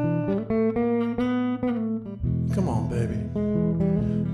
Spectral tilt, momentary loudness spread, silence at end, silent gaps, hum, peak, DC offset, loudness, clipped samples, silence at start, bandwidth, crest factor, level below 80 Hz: -9.5 dB/octave; 4 LU; 0 s; none; none; -12 dBFS; under 0.1%; -25 LUFS; under 0.1%; 0 s; 10.5 kHz; 12 dB; -42 dBFS